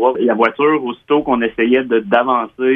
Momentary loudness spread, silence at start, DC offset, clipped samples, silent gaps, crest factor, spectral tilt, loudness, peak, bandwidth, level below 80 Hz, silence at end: 4 LU; 0 s; under 0.1%; under 0.1%; none; 14 dB; -8 dB/octave; -15 LUFS; 0 dBFS; 4.9 kHz; -52 dBFS; 0 s